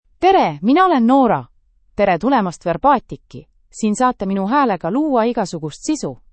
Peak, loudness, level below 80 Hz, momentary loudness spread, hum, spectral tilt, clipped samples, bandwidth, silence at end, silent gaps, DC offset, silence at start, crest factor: -2 dBFS; -17 LUFS; -48 dBFS; 10 LU; none; -5.5 dB/octave; under 0.1%; 8.8 kHz; 0.2 s; none; under 0.1%; 0.2 s; 16 dB